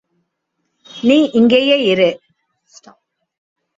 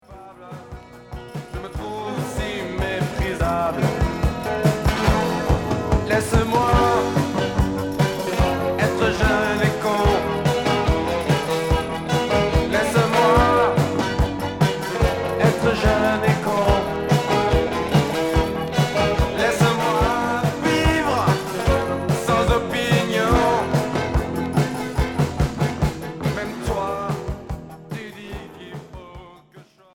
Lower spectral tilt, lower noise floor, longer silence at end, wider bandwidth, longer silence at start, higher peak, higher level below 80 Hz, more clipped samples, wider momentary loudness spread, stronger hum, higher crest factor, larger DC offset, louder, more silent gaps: about the same, -5.5 dB/octave vs -6 dB/octave; first, -72 dBFS vs -49 dBFS; first, 1.6 s vs 0.3 s; second, 7.6 kHz vs 18.5 kHz; first, 0.95 s vs 0.1 s; about the same, -2 dBFS vs -4 dBFS; second, -60 dBFS vs -30 dBFS; neither; second, 7 LU vs 14 LU; neither; about the same, 16 dB vs 16 dB; neither; first, -13 LUFS vs -20 LUFS; neither